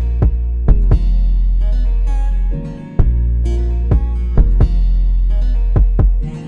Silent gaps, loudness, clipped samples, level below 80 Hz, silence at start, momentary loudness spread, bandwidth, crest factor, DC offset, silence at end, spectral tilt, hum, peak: none; -17 LUFS; under 0.1%; -12 dBFS; 0 s; 4 LU; 3.1 kHz; 12 dB; under 0.1%; 0 s; -9.5 dB/octave; none; 0 dBFS